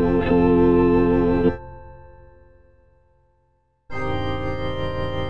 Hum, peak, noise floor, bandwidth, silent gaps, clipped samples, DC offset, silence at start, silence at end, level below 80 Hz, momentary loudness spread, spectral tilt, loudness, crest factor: none; -6 dBFS; -66 dBFS; 5.6 kHz; none; under 0.1%; under 0.1%; 0 s; 0 s; -36 dBFS; 15 LU; -9 dB/octave; -20 LUFS; 16 dB